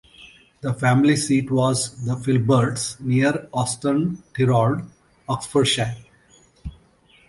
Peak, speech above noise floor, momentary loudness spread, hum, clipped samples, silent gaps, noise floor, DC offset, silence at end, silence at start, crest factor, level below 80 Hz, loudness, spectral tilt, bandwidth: -4 dBFS; 35 dB; 21 LU; none; under 0.1%; none; -55 dBFS; under 0.1%; 0.6 s; 0.2 s; 18 dB; -50 dBFS; -21 LUFS; -5.5 dB/octave; 11.5 kHz